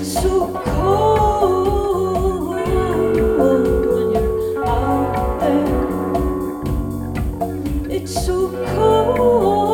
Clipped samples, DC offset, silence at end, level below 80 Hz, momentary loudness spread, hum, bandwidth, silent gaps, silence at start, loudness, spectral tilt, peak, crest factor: under 0.1%; under 0.1%; 0 s; -28 dBFS; 8 LU; none; 17.5 kHz; none; 0 s; -18 LUFS; -6.5 dB/octave; -2 dBFS; 16 dB